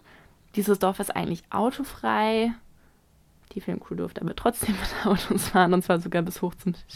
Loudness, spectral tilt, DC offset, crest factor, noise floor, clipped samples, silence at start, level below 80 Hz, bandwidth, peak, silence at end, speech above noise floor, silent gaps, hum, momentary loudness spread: -26 LUFS; -5 dB/octave; under 0.1%; 20 dB; -60 dBFS; under 0.1%; 0.55 s; -48 dBFS; 16 kHz; -6 dBFS; 0 s; 34 dB; none; none; 12 LU